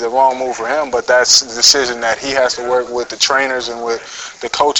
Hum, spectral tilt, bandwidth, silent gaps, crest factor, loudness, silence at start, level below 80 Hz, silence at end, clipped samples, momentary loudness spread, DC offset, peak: none; 0 dB/octave; 16.5 kHz; none; 14 dB; -14 LUFS; 0 s; -50 dBFS; 0 s; under 0.1%; 13 LU; under 0.1%; 0 dBFS